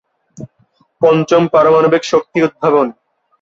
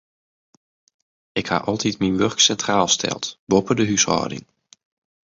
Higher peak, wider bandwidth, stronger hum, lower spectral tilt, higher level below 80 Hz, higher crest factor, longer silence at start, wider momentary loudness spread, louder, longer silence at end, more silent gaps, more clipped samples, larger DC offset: about the same, -2 dBFS vs -2 dBFS; about the same, 7.8 kHz vs 7.8 kHz; neither; first, -6 dB/octave vs -3 dB/octave; about the same, -56 dBFS vs -52 dBFS; second, 12 dB vs 20 dB; second, 0.4 s vs 1.35 s; second, 5 LU vs 12 LU; first, -12 LUFS vs -20 LUFS; second, 0.5 s vs 0.85 s; second, none vs 3.39-3.47 s; neither; neither